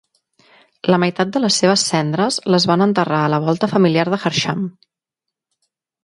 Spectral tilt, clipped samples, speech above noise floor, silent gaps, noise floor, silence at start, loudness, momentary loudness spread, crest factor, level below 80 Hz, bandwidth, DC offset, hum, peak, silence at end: -4.5 dB/octave; under 0.1%; 67 dB; none; -83 dBFS; 0.85 s; -16 LUFS; 5 LU; 18 dB; -60 dBFS; 11.5 kHz; under 0.1%; none; 0 dBFS; 1.35 s